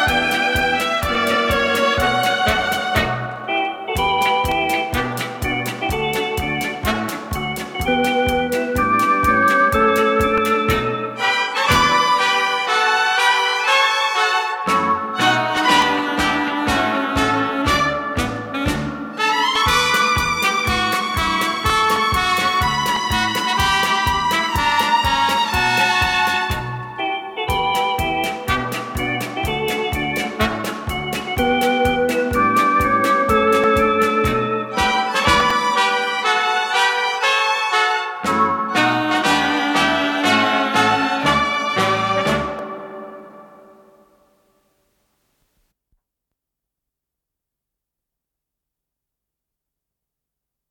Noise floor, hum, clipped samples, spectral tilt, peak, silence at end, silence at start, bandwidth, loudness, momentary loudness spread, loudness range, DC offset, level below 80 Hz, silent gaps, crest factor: -83 dBFS; none; under 0.1%; -3.5 dB/octave; -2 dBFS; 7.25 s; 0 s; 19 kHz; -17 LUFS; 8 LU; 5 LU; under 0.1%; -38 dBFS; none; 16 dB